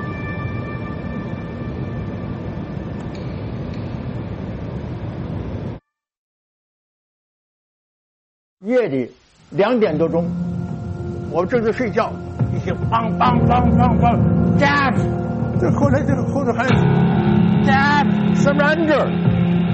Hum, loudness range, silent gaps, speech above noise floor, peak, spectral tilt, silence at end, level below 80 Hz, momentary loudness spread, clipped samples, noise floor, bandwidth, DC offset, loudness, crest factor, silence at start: none; 14 LU; 6.17-8.57 s; 23 dB; -2 dBFS; -8 dB/octave; 0 s; -36 dBFS; 13 LU; under 0.1%; -39 dBFS; 8 kHz; under 0.1%; -19 LUFS; 16 dB; 0 s